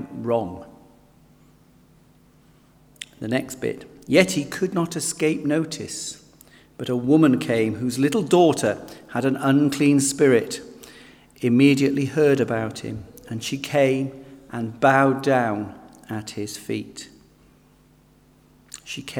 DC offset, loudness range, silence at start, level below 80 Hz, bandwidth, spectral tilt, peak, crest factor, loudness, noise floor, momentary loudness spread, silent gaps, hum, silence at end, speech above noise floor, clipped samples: under 0.1%; 13 LU; 0 s; -60 dBFS; 17 kHz; -5 dB/octave; -2 dBFS; 20 dB; -21 LUFS; -55 dBFS; 18 LU; none; none; 0 s; 34 dB; under 0.1%